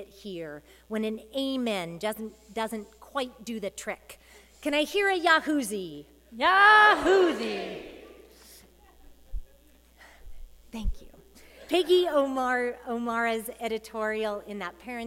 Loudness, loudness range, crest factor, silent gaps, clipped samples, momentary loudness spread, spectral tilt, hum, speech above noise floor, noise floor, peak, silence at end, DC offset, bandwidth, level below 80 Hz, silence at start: -26 LUFS; 18 LU; 22 dB; none; under 0.1%; 20 LU; -3.5 dB/octave; none; 31 dB; -58 dBFS; -6 dBFS; 0 s; under 0.1%; 16.5 kHz; -46 dBFS; 0 s